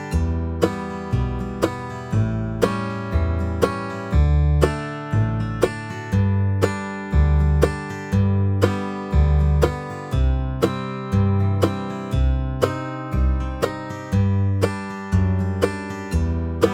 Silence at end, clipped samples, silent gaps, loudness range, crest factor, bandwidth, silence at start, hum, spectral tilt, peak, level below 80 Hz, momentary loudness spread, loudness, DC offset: 0 s; under 0.1%; none; 2 LU; 18 dB; 14.5 kHz; 0 s; none; -7.5 dB/octave; -2 dBFS; -26 dBFS; 8 LU; -22 LUFS; under 0.1%